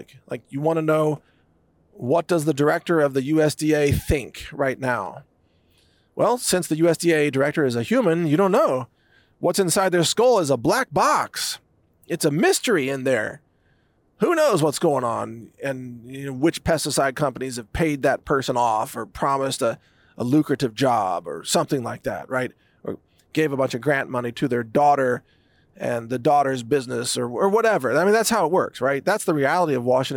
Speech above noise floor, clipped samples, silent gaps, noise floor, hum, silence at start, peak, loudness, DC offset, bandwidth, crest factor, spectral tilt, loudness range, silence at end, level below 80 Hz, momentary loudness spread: 41 dB; under 0.1%; none; -62 dBFS; none; 0 s; -8 dBFS; -21 LUFS; under 0.1%; 18 kHz; 12 dB; -4.5 dB/octave; 4 LU; 0 s; -48 dBFS; 12 LU